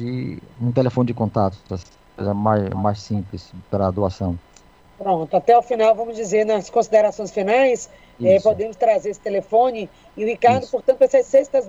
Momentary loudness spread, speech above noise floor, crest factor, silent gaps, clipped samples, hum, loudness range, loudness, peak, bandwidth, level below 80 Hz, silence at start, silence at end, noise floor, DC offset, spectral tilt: 13 LU; 31 dB; 16 dB; none; under 0.1%; none; 5 LU; -19 LUFS; -4 dBFS; 8 kHz; -50 dBFS; 0 s; 0 s; -50 dBFS; under 0.1%; -6.5 dB/octave